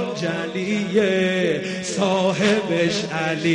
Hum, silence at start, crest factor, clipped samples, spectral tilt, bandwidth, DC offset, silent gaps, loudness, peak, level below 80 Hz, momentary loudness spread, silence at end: none; 0 s; 16 dB; under 0.1%; -5 dB/octave; 10.5 kHz; under 0.1%; none; -21 LUFS; -6 dBFS; -60 dBFS; 6 LU; 0 s